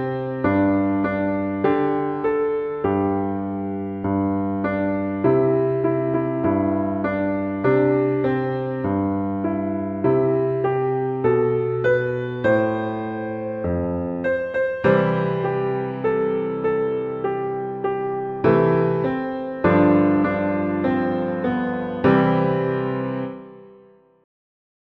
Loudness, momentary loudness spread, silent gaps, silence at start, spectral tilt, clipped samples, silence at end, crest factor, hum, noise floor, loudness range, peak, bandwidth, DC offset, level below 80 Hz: -21 LUFS; 7 LU; none; 0 s; -10.5 dB/octave; under 0.1%; 1.2 s; 18 dB; none; -51 dBFS; 3 LU; -4 dBFS; 5.2 kHz; under 0.1%; -52 dBFS